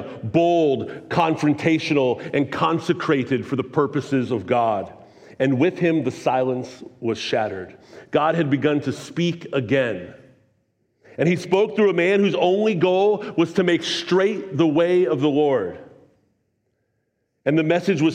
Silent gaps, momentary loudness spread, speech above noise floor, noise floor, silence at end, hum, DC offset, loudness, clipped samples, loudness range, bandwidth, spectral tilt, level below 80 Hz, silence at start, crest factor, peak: none; 9 LU; 52 dB; -72 dBFS; 0 s; none; under 0.1%; -21 LUFS; under 0.1%; 4 LU; 10 kHz; -6.5 dB/octave; -66 dBFS; 0 s; 16 dB; -4 dBFS